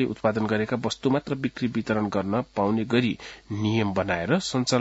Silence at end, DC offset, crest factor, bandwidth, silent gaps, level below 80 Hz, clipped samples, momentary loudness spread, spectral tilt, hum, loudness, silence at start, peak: 0 s; under 0.1%; 18 dB; 8 kHz; none; -56 dBFS; under 0.1%; 5 LU; -5.5 dB/octave; none; -26 LUFS; 0 s; -6 dBFS